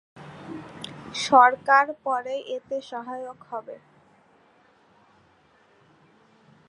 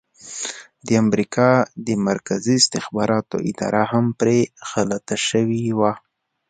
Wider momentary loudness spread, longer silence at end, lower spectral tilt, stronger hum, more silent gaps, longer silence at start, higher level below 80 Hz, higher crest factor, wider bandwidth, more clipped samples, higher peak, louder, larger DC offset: first, 24 LU vs 12 LU; first, 2.9 s vs 0.5 s; second, -3 dB/octave vs -4.5 dB/octave; neither; neither; about the same, 0.15 s vs 0.25 s; second, -72 dBFS vs -58 dBFS; about the same, 24 dB vs 20 dB; first, 11.5 kHz vs 9.4 kHz; neither; second, -4 dBFS vs 0 dBFS; about the same, -22 LUFS vs -20 LUFS; neither